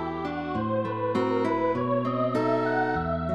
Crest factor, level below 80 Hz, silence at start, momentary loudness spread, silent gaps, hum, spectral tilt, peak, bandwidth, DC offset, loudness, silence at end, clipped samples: 12 dB; -50 dBFS; 0 s; 5 LU; none; none; -8 dB/octave; -14 dBFS; 10.5 kHz; 0.2%; -27 LUFS; 0 s; under 0.1%